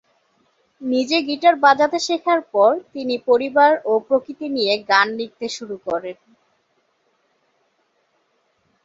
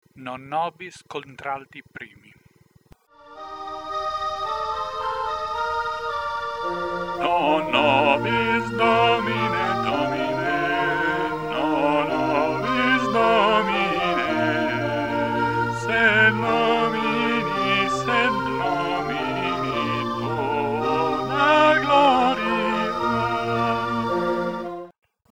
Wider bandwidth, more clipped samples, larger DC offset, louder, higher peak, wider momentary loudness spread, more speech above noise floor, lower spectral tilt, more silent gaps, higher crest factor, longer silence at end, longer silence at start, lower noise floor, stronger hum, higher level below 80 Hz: second, 7.8 kHz vs 18 kHz; neither; second, under 0.1% vs 0.3%; first, -18 LUFS vs -22 LUFS; about the same, -2 dBFS vs -4 dBFS; about the same, 13 LU vs 13 LU; first, 48 dB vs 33 dB; second, -3 dB/octave vs -5.5 dB/octave; neither; about the same, 18 dB vs 18 dB; first, 2.7 s vs 0.4 s; first, 0.8 s vs 0.15 s; first, -66 dBFS vs -57 dBFS; neither; second, -70 dBFS vs -52 dBFS